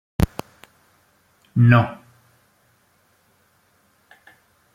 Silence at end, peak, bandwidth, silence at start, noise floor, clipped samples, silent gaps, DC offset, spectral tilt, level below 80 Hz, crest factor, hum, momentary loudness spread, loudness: 2.8 s; 0 dBFS; 15 kHz; 0.2 s; -62 dBFS; under 0.1%; none; under 0.1%; -8 dB/octave; -42 dBFS; 24 dB; none; 21 LU; -19 LUFS